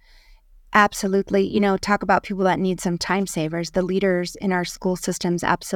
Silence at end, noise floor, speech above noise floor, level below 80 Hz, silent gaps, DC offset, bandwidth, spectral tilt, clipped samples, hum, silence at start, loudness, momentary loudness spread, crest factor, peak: 0 s; -51 dBFS; 30 dB; -48 dBFS; none; under 0.1%; 17.5 kHz; -5 dB/octave; under 0.1%; none; 0.7 s; -21 LUFS; 6 LU; 20 dB; -2 dBFS